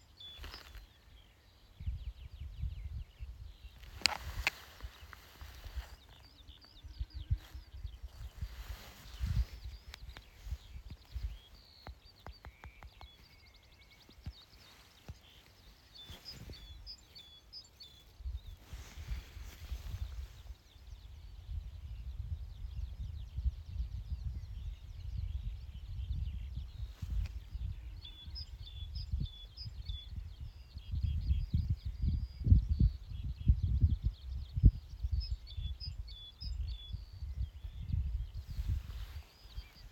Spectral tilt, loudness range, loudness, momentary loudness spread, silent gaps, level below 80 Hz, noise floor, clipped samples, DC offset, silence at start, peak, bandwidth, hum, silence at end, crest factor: -5 dB/octave; 17 LU; -41 LUFS; 21 LU; none; -42 dBFS; -62 dBFS; under 0.1%; under 0.1%; 0.1 s; -6 dBFS; 17 kHz; none; 0 s; 34 dB